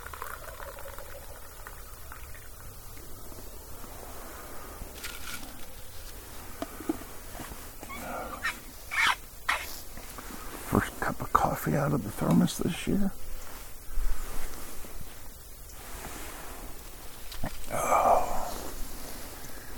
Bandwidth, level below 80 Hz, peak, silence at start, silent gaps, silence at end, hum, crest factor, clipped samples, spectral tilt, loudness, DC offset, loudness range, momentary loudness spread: 19 kHz; -42 dBFS; -6 dBFS; 0 s; none; 0 s; none; 26 dB; under 0.1%; -4.5 dB/octave; -33 LUFS; under 0.1%; 14 LU; 18 LU